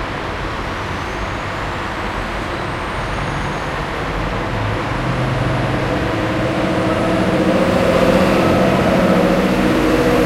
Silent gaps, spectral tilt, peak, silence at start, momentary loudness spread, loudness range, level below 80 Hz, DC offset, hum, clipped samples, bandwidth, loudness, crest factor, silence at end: none; -6 dB/octave; -2 dBFS; 0 s; 9 LU; 8 LU; -30 dBFS; under 0.1%; none; under 0.1%; 16 kHz; -17 LUFS; 16 dB; 0 s